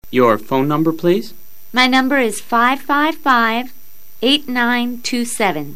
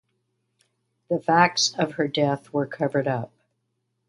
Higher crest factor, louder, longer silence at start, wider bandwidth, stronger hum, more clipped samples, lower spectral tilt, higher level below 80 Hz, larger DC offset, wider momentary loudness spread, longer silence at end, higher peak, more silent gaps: second, 16 dB vs 22 dB; first, -16 LUFS vs -23 LUFS; second, 0 s vs 1.1 s; first, 15.5 kHz vs 11.5 kHz; neither; neither; about the same, -4 dB/octave vs -4 dB/octave; first, -56 dBFS vs -70 dBFS; first, 3% vs under 0.1%; second, 7 LU vs 10 LU; second, 0 s vs 0.8 s; about the same, 0 dBFS vs -2 dBFS; neither